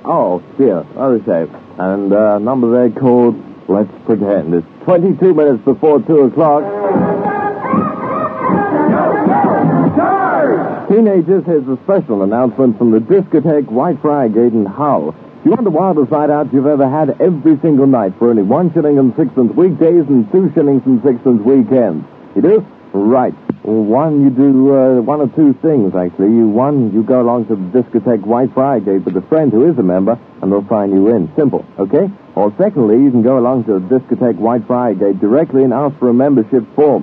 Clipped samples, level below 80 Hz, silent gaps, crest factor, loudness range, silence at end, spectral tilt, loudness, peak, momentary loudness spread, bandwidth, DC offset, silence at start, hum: under 0.1%; -58 dBFS; none; 12 dB; 2 LU; 0 s; -12.5 dB/octave; -12 LUFS; 0 dBFS; 6 LU; 4 kHz; under 0.1%; 0.05 s; none